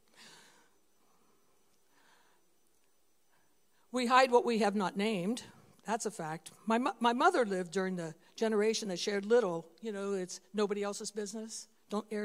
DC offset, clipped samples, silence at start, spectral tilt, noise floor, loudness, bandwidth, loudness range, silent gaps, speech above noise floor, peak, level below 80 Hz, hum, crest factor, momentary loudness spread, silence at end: under 0.1%; under 0.1%; 0.2 s; -4 dB/octave; -75 dBFS; -33 LUFS; 15.5 kHz; 4 LU; none; 43 dB; -10 dBFS; -84 dBFS; none; 24 dB; 14 LU; 0 s